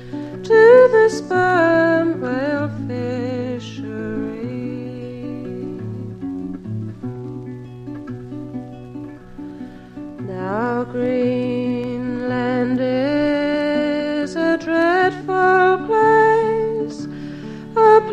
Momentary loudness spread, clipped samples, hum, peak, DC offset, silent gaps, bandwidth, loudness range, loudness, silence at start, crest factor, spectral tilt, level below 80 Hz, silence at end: 19 LU; under 0.1%; none; 0 dBFS; under 0.1%; none; 9.4 kHz; 14 LU; -18 LUFS; 0 s; 18 dB; -7 dB/octave; -50 dBFS; 0 s